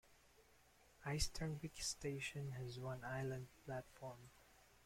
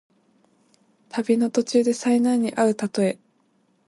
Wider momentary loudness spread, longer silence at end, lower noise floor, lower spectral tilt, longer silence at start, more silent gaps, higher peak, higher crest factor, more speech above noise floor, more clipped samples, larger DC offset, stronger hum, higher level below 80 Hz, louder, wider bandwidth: first, 12 LU vs 8 LU; second, 0 s vs 0.75 s; first, -71 dBFS vs -65 dBFS; second, -4 dB/octave vs -5.5 dB/octave; second, 0.05 s vs 1.15 s; neither; second, -26 dBFS vs -8 dBFS; first, 22 dB vs 16 dB; second, 24 dB vs 44 dB; neither; neither; neither; first, -60 dBFS vs -72 dBFS; second, -47 LUFS vs -22 LUFS; first, 16.5 kHz vs 11.5 kHz